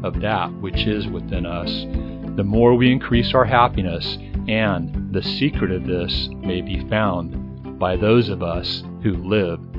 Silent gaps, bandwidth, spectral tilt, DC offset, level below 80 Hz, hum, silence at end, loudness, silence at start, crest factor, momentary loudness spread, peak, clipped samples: none; 5.8 kHz; -8.5 dB/octave; under 0.1%; -32 dBFS; none; 0 s; -20 LUFS; 0 s; 20 dB; 10 LU; 0 dBFS; under 0.1%